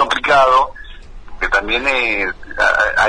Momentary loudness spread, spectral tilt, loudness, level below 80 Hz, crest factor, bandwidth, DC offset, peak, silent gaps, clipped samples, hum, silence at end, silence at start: 11 LU; -2.5 dB/octave; -15 LUFS; -34 dBFS; 14 dB; 10.5 kHz; under 0.1%; -2 dBFS; none; under 0.1%; none; 0 s; 0 s